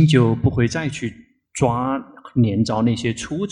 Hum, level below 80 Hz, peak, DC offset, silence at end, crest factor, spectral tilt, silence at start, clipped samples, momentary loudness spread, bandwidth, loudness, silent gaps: none; -44 dBFS; -2 dBFS; under 0.1%; 0 s; 16 dB; -6.5 dB/octave; 0 s; under 0.1%; 11 LU; 11 kHz; -20 LUFS; none